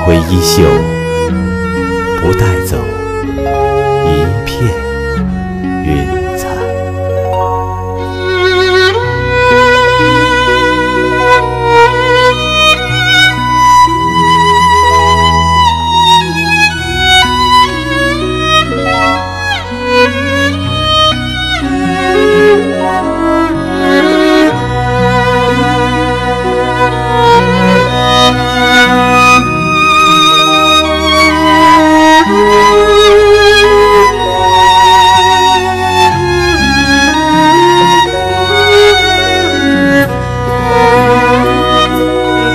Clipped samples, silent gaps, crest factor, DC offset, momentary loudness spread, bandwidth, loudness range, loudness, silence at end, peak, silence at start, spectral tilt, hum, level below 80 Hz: 1%; none; 8 dB; under 0.1%; 9 LU; 16 kHz; 8 LU; -8 LUFS; 0 s; 0 dBFS; 0 s; -4.5 dB/octave; none; -26 dBFS